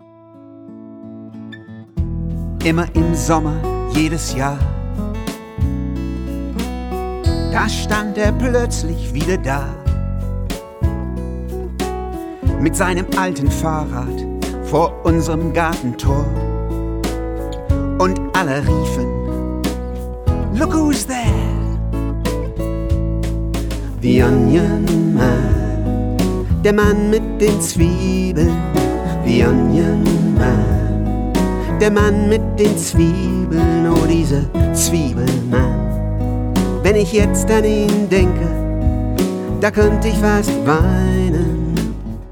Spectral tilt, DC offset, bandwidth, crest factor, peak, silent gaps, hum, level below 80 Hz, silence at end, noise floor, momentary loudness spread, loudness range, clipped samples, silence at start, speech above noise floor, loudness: -6 dB/octave; under 0.1%; 19 kHz; 14 dB; -2 dBFS; none; none; -24 dBFS; 0 s; -41 dBFS; 10 LU; 6 LU; under 0.1%; 0.35 s; 27 dB; -17 LUFS